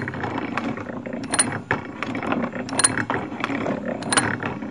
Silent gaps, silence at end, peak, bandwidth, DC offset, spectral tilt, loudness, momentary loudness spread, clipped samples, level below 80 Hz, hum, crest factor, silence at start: none; 0 s; 0 dBFS; 11.5 kHz; 0.2%; -3 dB/octave; -24 LUFS; 10 LU; under 0.1%; -56 dBFS; none; 24 dB; 0 s